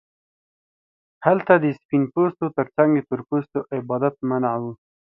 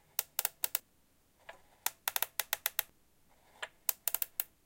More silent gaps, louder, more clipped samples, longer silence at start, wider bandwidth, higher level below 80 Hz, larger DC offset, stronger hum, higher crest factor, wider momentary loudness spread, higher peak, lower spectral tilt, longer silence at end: first, 1.85-1.89 s vs none; first, -22 LUFS vs -35 LUFS; neither; first, 1.2 s vs 0.2 s; second, 4.1 kHz vs 17.5 kHz; first, -66 dBFS vs -76 dBFS; neither; neither; second, 22 dB vs 32 dB; second, 9 LU vs 19 LU; first, 0 dBFS vs -8 dBFS; first, -11 dB/octave vs 2.5 dB/octave; first, 0.4 s vs 0.2 s